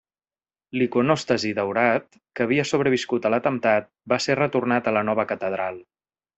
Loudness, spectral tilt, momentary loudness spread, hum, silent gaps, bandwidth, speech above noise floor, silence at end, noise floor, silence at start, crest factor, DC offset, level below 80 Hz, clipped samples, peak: -23 LUFS; -5.5 dB/octave; 7 LU; none; none; 8.2 kHz; over 67 dB; 0.55 s; under -90 dBFS; 0.75 s; 20 dB; under 0.1%; -64 dBFS; under 0.1%; -4 dBFS